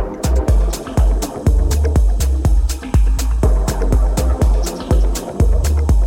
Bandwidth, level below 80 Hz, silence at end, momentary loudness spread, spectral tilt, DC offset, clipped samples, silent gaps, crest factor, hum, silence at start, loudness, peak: 16.5 kHz; -14 dBFS; 0 s; 3 LU; -6 dB/octave; under 0.1%; under 0.1%; none; 10 dB; none; 0 s; -17 LUFS; -2 dBFS